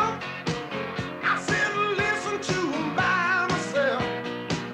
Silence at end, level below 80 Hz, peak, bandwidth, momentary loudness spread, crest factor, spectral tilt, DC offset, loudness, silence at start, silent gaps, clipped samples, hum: 0 s; -56 dBFS; -12 dBFS; 14 kHz; 8 LU; 14 dB; -4.5 dB/octave; under 0.1%; -26 LUFS; 0 s; none; under 0.1%; none